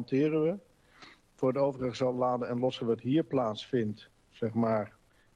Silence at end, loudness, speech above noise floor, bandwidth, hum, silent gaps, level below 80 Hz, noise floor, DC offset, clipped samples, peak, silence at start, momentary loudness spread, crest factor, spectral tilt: 0.5 s; -31 LUFS; 27 dB; 9.6 kHz; none; none; -68 dBFS; -57 dBFS; under 0.1%; under 0.1%; -18 dBFS; 0 s; 8 LU; 14 dB; -7.5 dB/octave